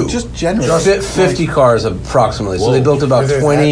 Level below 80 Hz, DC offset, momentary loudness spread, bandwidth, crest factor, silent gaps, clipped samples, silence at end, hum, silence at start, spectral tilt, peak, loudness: -32 dBFS; under 0.1%; 5 LU; 10.5 kHz; 12 dB; none; under 0.1%; 0 s; none; 0 s; -5.5 dB/octave; 0 dBFS; -13 LUFS